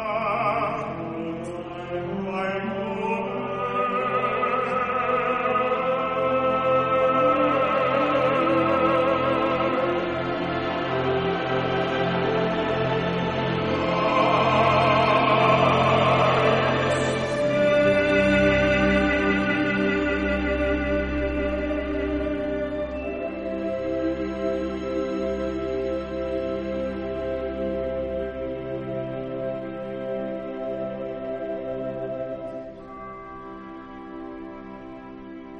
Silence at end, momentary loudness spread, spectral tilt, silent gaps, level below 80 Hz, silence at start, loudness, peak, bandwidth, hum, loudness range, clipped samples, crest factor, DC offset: 0 s; 13 LU; -6.5 dB/octave; none; -42 dBFS; 0 s; -24 LUFS; -6 dBFS; 10.5 kHz; none; 11 LU; under 0.1%; 18 dB; under 0.1%